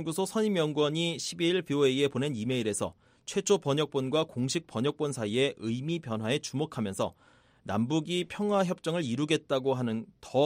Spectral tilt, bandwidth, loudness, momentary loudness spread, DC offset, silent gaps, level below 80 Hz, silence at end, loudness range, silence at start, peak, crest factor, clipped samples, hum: -5 dB/octave; 16 kHz; -30 LUFS; 7 LU; under 0.1%; none; -68 dBFS; 0 s; 3 LU; 0 s; -14 dBFS; 16 dB; under 0.1%; none